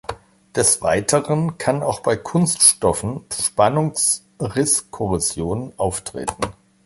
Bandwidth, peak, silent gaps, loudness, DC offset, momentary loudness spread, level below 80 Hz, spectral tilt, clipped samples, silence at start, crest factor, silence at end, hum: 12 kHz; 0 dBFS; none; -19 LUFS; under 0.1%; 13 LU; -44 dBFS; -3.5 dB/octave; under 0.1%; 0.1 s; 20 dB; 0.35 s; none